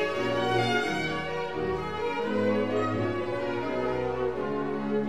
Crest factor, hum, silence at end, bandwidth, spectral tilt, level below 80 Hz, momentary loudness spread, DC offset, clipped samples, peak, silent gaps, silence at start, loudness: 14 dB; none; 0 s; 14.5 kHz; -6 dB/octave; -54 dBFS; 5 LU; 0.6%; under 0.1%; -14 dBFS; none; 0 s; -29 LUFS